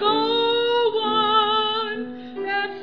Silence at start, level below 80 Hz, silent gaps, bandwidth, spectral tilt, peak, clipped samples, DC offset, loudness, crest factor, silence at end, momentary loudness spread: 0 s; -70 dBFS; none; 5.4 kHz; -5 dB/octave; -8 dBFS; under 0.1%; 0.4%; -21 LUFS; 14 dB; 0 s; 12 LU